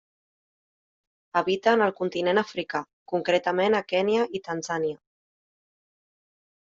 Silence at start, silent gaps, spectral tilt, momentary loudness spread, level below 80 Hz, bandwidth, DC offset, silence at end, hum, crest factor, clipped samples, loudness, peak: 1.35 s; 2.93-3.06 s; -4.5 dB/octave; 9 LU; -72 dBFS; 7.6 kHz; under 0.1%; 1.85 s; none; 20 dB; under 0.1%; -25 LUFS; -8 dBFS